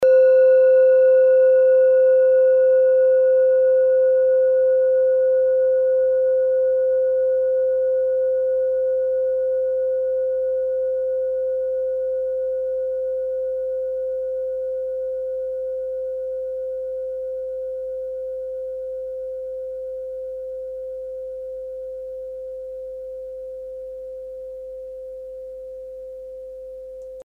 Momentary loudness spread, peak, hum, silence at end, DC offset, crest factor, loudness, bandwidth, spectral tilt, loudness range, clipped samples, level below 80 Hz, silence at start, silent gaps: 20 LU; -8 dBFS; none; 0 s; under 0.1%; 12 dB; -19 LUFS; 2.8 kHz; -5.5 dB/octave; 18 LU; under 0.1%; -58 dBFS; 0 s; none